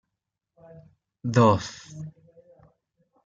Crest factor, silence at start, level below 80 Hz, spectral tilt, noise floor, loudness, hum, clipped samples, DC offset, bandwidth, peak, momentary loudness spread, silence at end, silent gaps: 22 dB; 1.25 s; -62 dBFS; -6.5 dB/octave; -84 dBFS; -22 LUFS; none; under 0.1%; under 0.1%; 7.8 kHz; -6 dBFS; 22 LU; 1.15 s; none